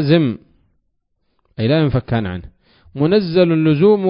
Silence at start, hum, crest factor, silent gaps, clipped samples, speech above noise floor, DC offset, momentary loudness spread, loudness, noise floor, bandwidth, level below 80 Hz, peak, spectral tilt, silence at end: 0 s; none; 16 dB; none; under 0.1%; 53 dB; under 0.1%; 18 LU; -16 LUFS; -68 dBFS; 5.4 kHz; -42 dBFS; 0 dBFS; -12.5 dB/octave; 0 s